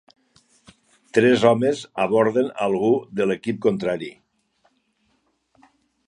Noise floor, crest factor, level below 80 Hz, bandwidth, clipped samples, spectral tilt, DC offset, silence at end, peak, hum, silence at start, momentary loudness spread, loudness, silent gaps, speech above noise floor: -68 dBFS; 22 dB; -64 dBFS; 10.5 kHz; under 0.1%; -6 dB/octave; under 0.1%; 2 s; -2 dBFS; none; 1.15 s; 9 LU; -21 LUFS; none; 48 dB